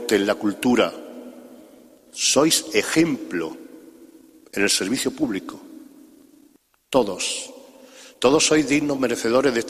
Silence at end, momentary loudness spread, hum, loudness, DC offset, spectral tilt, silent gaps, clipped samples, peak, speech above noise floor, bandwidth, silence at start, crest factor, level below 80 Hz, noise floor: 0 s; 21 LU; none; -21 LUFS; under 0.1%; -3 dB/octave; none; under 0.1%; -2 dBFS; 37 dB; 15 kHz; 0 s; 20 dB; -56 dBFS; -58 dBFS